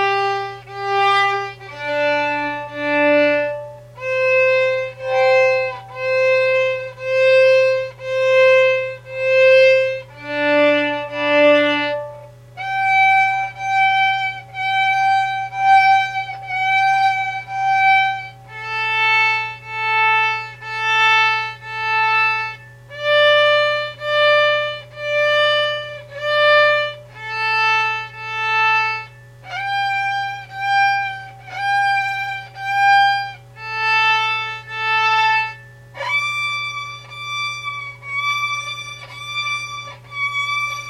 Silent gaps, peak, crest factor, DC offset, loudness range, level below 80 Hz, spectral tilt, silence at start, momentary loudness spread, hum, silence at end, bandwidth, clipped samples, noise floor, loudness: none; -2 dBFS; 16 dB; under 0.1%; 5 LU; -58 dBFS; -3.5 dB/octave; 0 s; 14 LU; none; 0 s; 12.5 kHz; under 0.1%; -38 dBFS; -17 LUFS